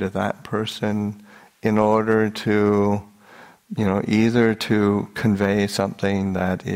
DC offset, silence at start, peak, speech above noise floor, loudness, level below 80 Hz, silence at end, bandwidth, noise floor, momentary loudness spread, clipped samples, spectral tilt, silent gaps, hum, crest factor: under 0.1%; 0 s; -4 dBFS; 27 dB; -21 LUFS; -54 dBFS; 0 s; 16 kHz; -47 dBFS; 8 LU; under 0.1%; -6.5 dB/octave; none; none; 18 dB